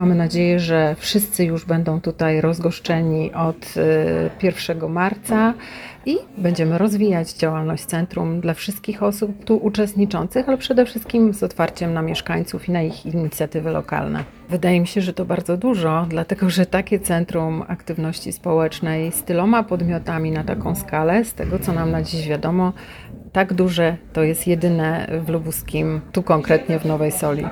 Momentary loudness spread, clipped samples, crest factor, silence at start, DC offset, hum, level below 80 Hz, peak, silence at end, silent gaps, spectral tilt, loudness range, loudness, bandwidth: 6 LU; under 0.1%; 18 dB; 0 s; under 0.1%; none; -44 dBFS; -2 dBFS; 0 s; none; -6 dB/octave; 2 LU; -20 LUFS; 19 kHz